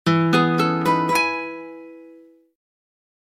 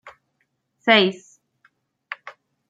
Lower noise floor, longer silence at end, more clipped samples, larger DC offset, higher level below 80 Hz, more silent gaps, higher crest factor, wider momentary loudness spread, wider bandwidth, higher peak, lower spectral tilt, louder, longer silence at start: second, -48 dBFS vs -72 dBFS; first, 1.15 s vs 0.4 s; neither; neither; first, -66 dBFS vs -76 dBFS; neither; second, 18 dB vs 24 dB; about the same, 19 LU vs 21 LU; first, 15.5 kHz vs 7.8 kHz; about the same, -4 dBFS vs -2 dBFS; about the same, -5.5 dB/octave vs -5 dB/octave; about the same, -19 LUFS vs -18 LUFS; about the same, 0.05 s vs 0.05 s